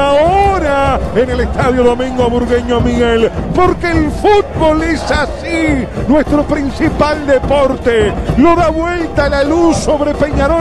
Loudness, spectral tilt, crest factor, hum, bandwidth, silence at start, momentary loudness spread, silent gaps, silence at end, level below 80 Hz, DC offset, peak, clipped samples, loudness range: -12 LUFS; -6.5 dB/octave; 10 dB; none; 12.5 kHz; 0 s; 4 LU; none; 0 s; -22 dBFS; under 0.1%; 0 dBFS; under 0.1%; 1 LU